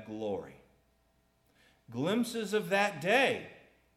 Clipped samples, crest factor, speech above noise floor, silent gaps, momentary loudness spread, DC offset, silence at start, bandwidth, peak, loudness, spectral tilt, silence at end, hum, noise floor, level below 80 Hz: under 0.1%; 20 dB; 40 dB; none; 17 LU; under 0.1%; 0 s; 16 kHz; -14 dBFS; -31 LUFS; -4.5 dB/octave; 0.4 s; none; -72 dBFS; -74 dBFS